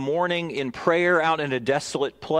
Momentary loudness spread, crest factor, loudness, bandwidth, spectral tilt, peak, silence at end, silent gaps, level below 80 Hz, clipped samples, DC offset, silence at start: 8 LU; 18 dB; -23 LUFS; 12.5 kHz; -5 dB/octave; -6 dBFS; 0 s; none; -62 dBFS; under 0.1%; under 0.1%; 0 s